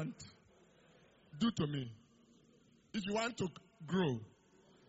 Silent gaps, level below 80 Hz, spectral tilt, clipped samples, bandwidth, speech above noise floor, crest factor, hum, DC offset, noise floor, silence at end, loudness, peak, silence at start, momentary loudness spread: none; -72 dBFS; -5 dB/octave; under 0.1%; 7.6 kHz; 30 dB; 18 dB; none; under 0.1%; -68 dBFS; 0.6 s; -39 LUFS; -24 dBFS; 0 s; 21 LU